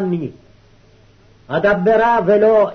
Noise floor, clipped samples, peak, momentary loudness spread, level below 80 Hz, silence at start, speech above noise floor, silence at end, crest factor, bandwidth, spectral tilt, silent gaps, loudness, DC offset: -49 dBFS; under 0.1%; -6 dBFS; 12 LU; -48 dBFS; 0 s; 35 dB; 0 s; 12 dB; 6.4 kHz; -8 dB/octave; none; -15 LUFS; under 0.1%